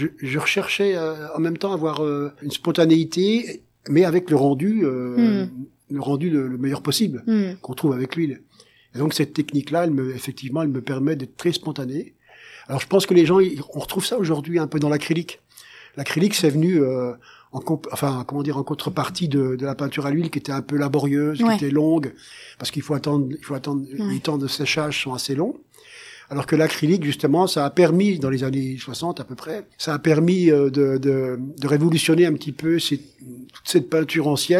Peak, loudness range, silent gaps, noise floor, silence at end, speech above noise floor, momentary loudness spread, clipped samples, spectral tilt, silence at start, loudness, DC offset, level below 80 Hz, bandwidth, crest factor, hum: -2 dBFS; 5 LU; none; -46 dBFS; 0 s; 25 dB; 13 LU; under 0.1%; -6 dB/octave; 0 s; -21 LUFS; under 0.1%; -62 dBFS; 15.5 kHz; 18 dB; none